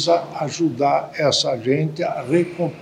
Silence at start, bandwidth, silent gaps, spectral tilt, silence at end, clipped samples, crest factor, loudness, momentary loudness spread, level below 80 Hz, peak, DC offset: 0 s; 11.5 kHz; none; -5 dB/octave; 0 s; under 0.1%; 16 dB; -20 LUFS; 6 LU; -64 dBFS; -4 dBFS; under 0.1%